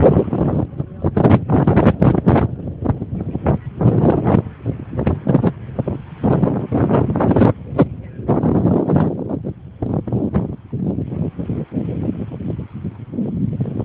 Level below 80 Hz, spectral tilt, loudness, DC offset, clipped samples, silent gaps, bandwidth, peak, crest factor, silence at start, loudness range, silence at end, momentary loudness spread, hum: -34 dBFS; -12.5 dB/octave; -18 LUFS; under 0.1%; under 0.1%; none; 4.2 kHz; 0 dBFS; 18 dB; 0 s; 7 LU; 0 s; 12 LU; none